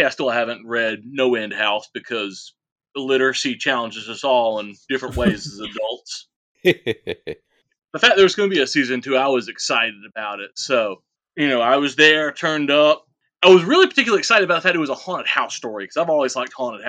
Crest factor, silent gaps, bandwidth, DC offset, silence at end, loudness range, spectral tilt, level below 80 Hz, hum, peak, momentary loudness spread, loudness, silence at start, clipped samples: 20 dB; 2.72-2.76 s, 6.36-6.55 s; 9.6 kHz; under 0.1%; 0 s; 7 LU; -3.5 dB/octave; -50 dBFS; none; 0 dBFS; 16 LU; -18 LUFS; 0 s; under 0.1%